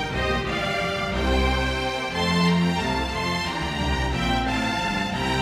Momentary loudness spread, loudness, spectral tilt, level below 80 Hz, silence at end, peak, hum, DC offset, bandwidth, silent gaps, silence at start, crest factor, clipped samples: 4 LU; -24 LUFS; -5 dB/octave; -32 dBFS; 0 s; -8 dBFS; none; under 0.1%; 15 kHz; none; 0 s; 16 dB; under 0.1%